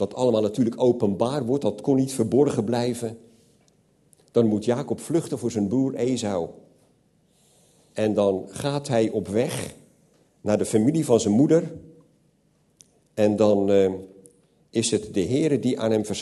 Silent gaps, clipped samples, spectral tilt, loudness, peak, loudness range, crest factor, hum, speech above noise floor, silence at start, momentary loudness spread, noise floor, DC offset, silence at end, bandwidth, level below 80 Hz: none; under 0.1%; -6 dB/octave; -23 LUFS; -6 dBFS; 4 LU; 18 dB; none; 42 dB; 0 s; 10 LU; -64 dBFS; under 0.1%; 0 s; 12.5 kHz; -62 dBFS